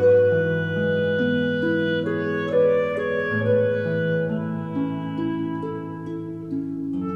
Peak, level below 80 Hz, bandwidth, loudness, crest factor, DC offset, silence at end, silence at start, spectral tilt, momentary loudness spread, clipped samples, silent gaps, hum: -8 dBFS; -62 dBFS; 5.2 kHz; -23 LUFS; 14 dB; 0.1%; 0 s; 0 s; -8.5 dB/octave; 10 LU; under 0.1%; none; none